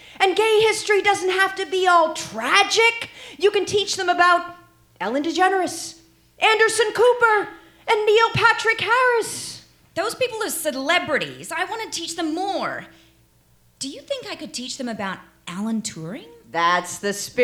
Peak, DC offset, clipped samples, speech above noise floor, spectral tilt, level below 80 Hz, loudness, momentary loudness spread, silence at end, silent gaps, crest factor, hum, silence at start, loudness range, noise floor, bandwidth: 0 dBFS; under 0.1%; under 0.1%; 37 dB; -2.5 dB/octave; -60 dBFS; -20 LUFS; 16 LU; 0 s; none; 20 dB; none; 0.1 s; 11 LU; -58 dBFS; 17.5 kHz